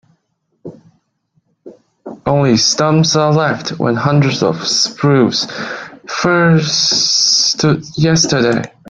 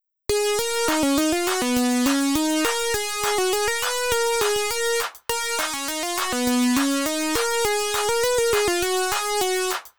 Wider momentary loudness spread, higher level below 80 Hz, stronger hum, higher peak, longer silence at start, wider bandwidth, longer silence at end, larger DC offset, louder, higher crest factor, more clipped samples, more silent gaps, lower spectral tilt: first, 9 LU vs 4 LU; about the same, -48 dBFS vs -48 dBFS; neither; first, 0 dBFS vs -8 dBFS; first, 0.65 s vs 0 s; second, 9 kHz vs over 20 kHz; first, 0.2 s vs 0 s; second, under 0.1% vs 0.7%; first, -12 LUFS vs -22 LUFS; about the same, 14 dB vs 16 dB; neither; neither; first, -4 dB/octave vs -1.5 dB/octave